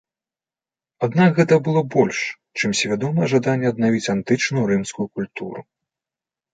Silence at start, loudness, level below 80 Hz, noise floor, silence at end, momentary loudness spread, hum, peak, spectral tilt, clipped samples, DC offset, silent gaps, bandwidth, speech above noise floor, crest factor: 1 s; -20 LUFS; -60 dBFS; under -90 dBFS; 0.9 s; 11 LU; none; -2 dBFS; -5.5 dB/octave; under 0.1%; under 0.1%; none; 9.4 kHz; over 71 dB; 18 dB